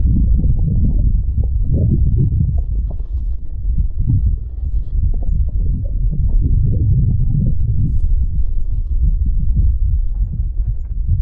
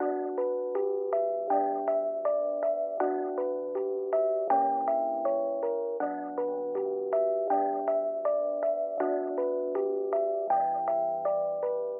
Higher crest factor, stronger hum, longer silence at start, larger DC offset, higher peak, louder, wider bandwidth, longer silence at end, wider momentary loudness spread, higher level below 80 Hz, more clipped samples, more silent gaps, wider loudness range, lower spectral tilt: about the same, 10 dB vs 14 dB; neither; about the same, 0 s vs 0 s; neither; first, -4 dBFS vs -14 dBFS; first, -19 LUFS vs -29 LUFS; second, 0.9 kHz vs 3 kHz; about the same, 0 s vs 0 s; first, 8 LU vs 4 LU; first, -16 dBFS vs under -90 dBFS; neither; neither; about the same, 3 LU vs 1 LU; first, -14.5 dB/octave vs 0 dB/octave